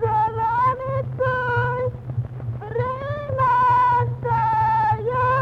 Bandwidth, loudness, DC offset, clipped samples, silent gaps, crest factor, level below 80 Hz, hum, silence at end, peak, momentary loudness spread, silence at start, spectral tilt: 6 kHz; -21 LUFS; under 0.1%; under 0.1%; none; 12 dB; -44 dBFS; none; 0 s; -10 dBFS; 11 LU; 0 s; -8 dB/octave